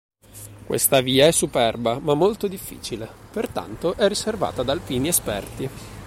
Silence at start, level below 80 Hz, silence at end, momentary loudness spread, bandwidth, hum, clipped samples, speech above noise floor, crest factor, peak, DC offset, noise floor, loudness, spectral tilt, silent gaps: 0.35 s; -46 dBFS; 0 s; 16 LU; 16.5 kHz; none; under 0.1%; 20 dB; 20 dB; -4 dBFS; under 0.1%; -42 dBFS; -22 LUFS; -3.5 dB/octave; none